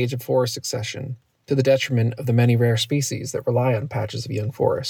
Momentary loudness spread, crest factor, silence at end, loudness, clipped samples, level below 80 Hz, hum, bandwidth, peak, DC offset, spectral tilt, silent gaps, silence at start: 9 LU; 16 dB; 0 s; -22 LUFS; under 0.1%; -64 dBFS; none; 18.5 kHz; -6 dBFS; under 0.1%; -5.5 dB/octave; none; 0 s